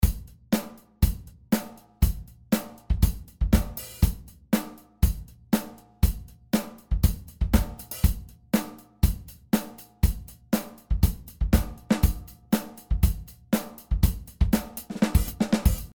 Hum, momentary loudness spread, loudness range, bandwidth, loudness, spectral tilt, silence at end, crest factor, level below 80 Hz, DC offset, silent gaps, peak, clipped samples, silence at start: none; 14 LU; 1 LU; over 20 kHz; -27 LUFS; -6 dB/octave; 0.1 s; 20 dB; -28 dBFS; under 0.1%; none; -6 dBFS; under 0.1%; 0 s